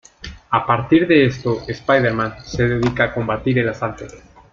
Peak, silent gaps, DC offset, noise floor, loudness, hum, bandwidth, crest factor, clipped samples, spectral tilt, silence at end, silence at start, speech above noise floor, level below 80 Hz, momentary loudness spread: -2 dBFS; none; under 0.1%; -37 dBFS; -18 LUFS; none; 7.4 kHz; 18 dB; under 0.1%; -7 dB/octave; 0.35 s; 0.2 s; 19 dB; -42 dBFS; 12 LU